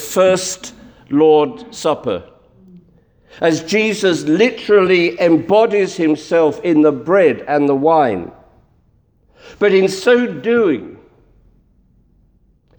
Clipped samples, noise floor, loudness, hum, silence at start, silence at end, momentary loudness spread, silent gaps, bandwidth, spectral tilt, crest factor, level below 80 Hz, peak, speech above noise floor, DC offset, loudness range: under 0.1%; -56 dBFS; -15 LUFS; none; 0 s; 1.85 s; 9 LU; none; over 20 kHz; -5 dB/octave; 14 dB; -56 dBFS; -2 dBFS; 42 dB; under 0.1%; 4 LU